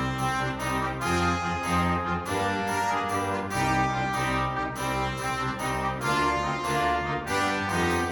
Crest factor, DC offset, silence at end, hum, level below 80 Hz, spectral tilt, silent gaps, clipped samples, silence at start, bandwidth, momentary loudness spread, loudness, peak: 14 dB; under 0.1%; 0 s; none; -44 dBFS; -4.5 dB/octave; none; under 0.1%; 0 s; 19 kHz; 3 LU; -27 LUFS; -12 dBFS